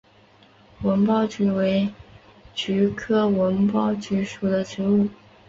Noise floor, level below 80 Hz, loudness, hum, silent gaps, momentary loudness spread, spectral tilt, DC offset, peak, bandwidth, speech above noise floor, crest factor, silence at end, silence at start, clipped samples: -54 dBFS; -54 dBFS; -23 LUFS; none; none; 7 LU; -7 dB/octave; under 0.1%; -10 dBFS; 7.6 kHz; 33 dB; 14 dB; 0.35 s; 0.8 s; under 0.1%